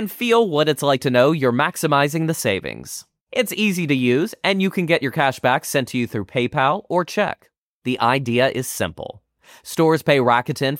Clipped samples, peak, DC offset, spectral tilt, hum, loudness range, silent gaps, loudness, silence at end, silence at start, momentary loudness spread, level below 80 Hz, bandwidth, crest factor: under 0.1%; -4 dBFS; under 0.1%; -5 dB/octave; none; 2 LU; 3.21-3.27 s, 7.58-7.82 s; -19 LUFS; 0 s; 0 s; 10 LU; -58 dBFS; 17 kHz; 16 dB